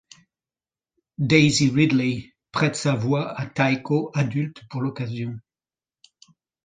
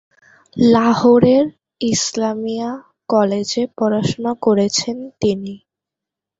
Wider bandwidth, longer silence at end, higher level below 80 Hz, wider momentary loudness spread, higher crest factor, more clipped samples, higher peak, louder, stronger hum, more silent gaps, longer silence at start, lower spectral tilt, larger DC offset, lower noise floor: first, 9.6 kHz vs 8 kHz; first, 1.25 s vs 0.85 s; second, -58 dBFS vs -52 dBFS; about the same, 14 LU vs 13 LU; first, 22 dB vs 16 dB; neither; about the same, -2 dBFS vs -2 dBFS; second, -23 LUFS vs -17 LUFS; neither; neither; first, 1.2 s vs 0.55 s; about the same, -5.5 dB/octave vs -5 dB/octave; neither; first, under -90 dBFS vs -85 dBFS